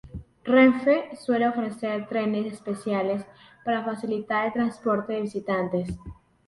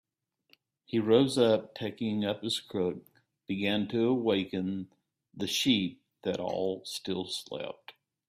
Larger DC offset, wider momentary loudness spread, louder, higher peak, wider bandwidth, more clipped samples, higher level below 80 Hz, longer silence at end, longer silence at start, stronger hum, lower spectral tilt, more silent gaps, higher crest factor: neither; about the same, 14 LU vs 14 LU; first, -25 LUFS vs -31 LUFS; first, -6 dBFS vs -10 dBFS; second, 11.5 kHz vs 16 kHz; neither; first, -54 dBFS vs -70 dBFS; about the same, 0.35 s vs 0.4 s; second, 0.05 s vs 0.9 s; neither; first, -7 dB/octave vs -5 dB/octave; neither; about the same, 20 dB vs 20 dB